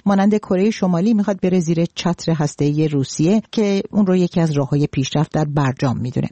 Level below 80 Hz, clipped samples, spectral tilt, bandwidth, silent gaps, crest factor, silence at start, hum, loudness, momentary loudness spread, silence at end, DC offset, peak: -50 dBFS; under 0.1%; -7 dB/octave; 8.8 kHz; none; 10 dB; 0.05 s; none; -18 LUFS; 4 LU; 0.05 s; under 0.1%; -6 dBFS